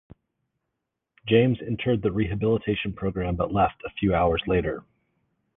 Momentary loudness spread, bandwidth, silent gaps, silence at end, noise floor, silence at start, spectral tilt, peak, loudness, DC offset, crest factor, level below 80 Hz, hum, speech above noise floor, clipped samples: 8 LU; 3.9 kHz; none; 0.75 s; -82 dBFS; 1.25 s; -10.5 dB/octave; -6 dBFS; -25 LUFS; under 0.1%; 20 dB; -42 dBFS; none; 58 dB; under 0.1%